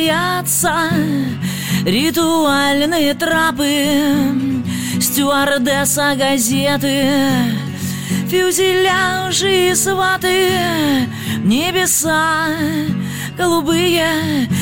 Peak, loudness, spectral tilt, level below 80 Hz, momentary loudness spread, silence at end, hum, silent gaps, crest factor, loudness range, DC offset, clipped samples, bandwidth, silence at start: -2 dBFS; -15 LUFS; -3.5 dB/octave; -48 dBFS; 6 LU; 0 s; none; none; 12 dB; 1 LU; under 0.1%; under 0.1%; 17 kHz; 0 s